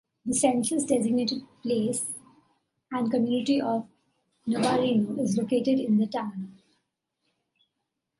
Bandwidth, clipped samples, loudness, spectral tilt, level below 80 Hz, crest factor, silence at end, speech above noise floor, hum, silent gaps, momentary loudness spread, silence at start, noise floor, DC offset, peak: 11.5 kHz; under 0.1%; -27 LUFS; -4.5 dB/octave; -70 dBFS; 18 dB; 1.7 s; 57 dB; none; none; 11 LU; 0.25 s; -82 dBFS; under 0.1%; -10 dBFS